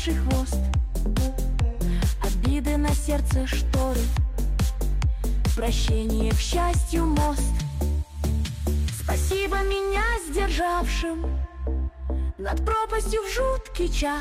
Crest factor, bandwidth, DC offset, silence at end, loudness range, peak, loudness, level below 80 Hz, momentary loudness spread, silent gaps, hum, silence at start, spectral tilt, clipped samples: 10 dB; 16 kHz; under 0.1%; 0 s; 2 LU; -14 dBFS; -26 LUFS; -26 dBFS; 4 LU; none; none; 0 s; -5.5 dB/octave; under 0.1%